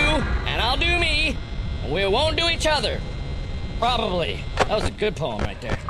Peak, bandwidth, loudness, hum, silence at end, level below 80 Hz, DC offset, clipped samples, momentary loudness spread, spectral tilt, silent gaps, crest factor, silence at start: -6 dBFS; 13 kHz; -23 LUFS; none; 0 s; -30 dBFS; 0.6%; under 0.1%; 12 LU; -4.5 dB/octave; none; 18 dB; 0 s